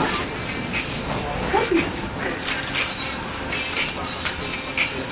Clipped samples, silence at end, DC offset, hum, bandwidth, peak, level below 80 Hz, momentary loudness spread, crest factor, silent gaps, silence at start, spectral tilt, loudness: under 0.1%; 0 s; under 0.1%; none; 4 kHz; -8 dBFS; -40 dBFS; 5 LU; 18 dB; none; 0 s; -2.5 dB/octave; -25 LUFS